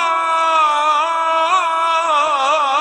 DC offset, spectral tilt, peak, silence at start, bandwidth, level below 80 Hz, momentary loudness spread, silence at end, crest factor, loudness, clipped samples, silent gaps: under 0.1%; 0.5 dB/octave; -4 dBFS; 0 s; 10.5 kHz; -68 dBFS; 2 LU; 0 s; 12 dB; -15 LUFS; under 0.1%; none